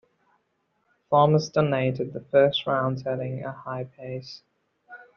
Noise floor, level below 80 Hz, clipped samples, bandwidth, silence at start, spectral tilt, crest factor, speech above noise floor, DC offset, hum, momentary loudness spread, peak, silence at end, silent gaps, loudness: -73 dBFS; -64 dBFS; under 0.1%; 7 kHz; 1.1 s; -5 dB/octave; 20 dB; 49 dB; under 0.1%; none; 16 LU; -6 dBFS; 0.15 s; none; -24 LUFS